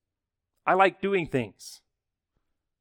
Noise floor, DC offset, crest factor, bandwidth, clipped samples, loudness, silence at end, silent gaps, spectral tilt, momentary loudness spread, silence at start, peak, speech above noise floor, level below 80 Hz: -86 dBFS; under 0.1%; 22 dB; 16.5 kHz; under 0.1%; -25 LUFS; 1.05 s; none; -5.5 dB/octave; 21 LU; 0.65 s; -6 dBFS; 60 dB; -64 dBFS